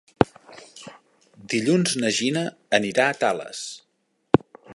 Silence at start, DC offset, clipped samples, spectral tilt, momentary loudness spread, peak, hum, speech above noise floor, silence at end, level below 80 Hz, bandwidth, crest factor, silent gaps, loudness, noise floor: 0.2 s; under 0.1%; under 0.1%; -4.5 dB/octave; 21 LU; 0 dBFS; none; 45 dB; 0 s; -54 dBFS; 11.5 kHz; 24 dB; none; -23 LUFS; -68 dBFS